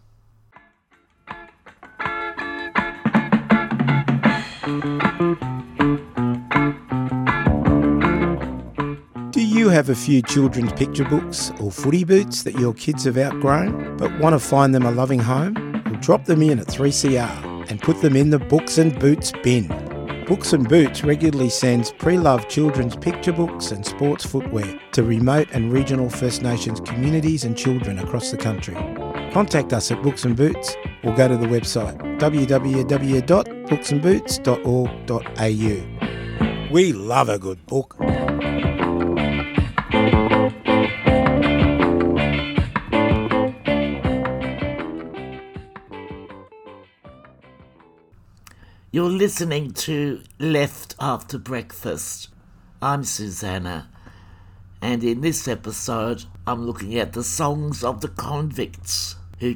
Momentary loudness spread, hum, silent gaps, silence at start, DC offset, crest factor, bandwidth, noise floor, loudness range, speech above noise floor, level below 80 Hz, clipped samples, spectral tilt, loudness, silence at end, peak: 11 LU; none; none; 1.25 s; under 0.1%; 20 dB; 19 kHz; -60 dBFS; 8 LU; 40 dB; -38 dBFS; under 0.1%; -5.5 dB/octave; -20 LUFS; 0 s; -2 dBFS